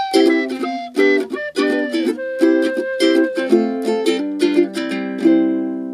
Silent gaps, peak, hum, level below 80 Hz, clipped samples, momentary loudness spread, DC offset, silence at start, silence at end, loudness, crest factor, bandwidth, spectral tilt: none; -2 dBFS; none; -68 dBFS; under 0.1%; 7 LU; under 0.1%; 0 s; 0 s; -17 LUFS; 16 dB; 12.5 kHz; -4.5 dB/octave